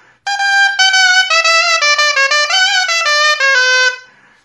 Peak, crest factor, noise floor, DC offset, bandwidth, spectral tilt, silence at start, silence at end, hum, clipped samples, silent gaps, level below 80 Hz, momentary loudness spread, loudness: 0 dBFS; 12 dB; -37 dBFS; under 0.1%; 12 kHz; 5 dB/octave; 0.25 s; 0.45 s; none; under 0.1%; none; -74 dBFS; 4 LU; -9 LUFS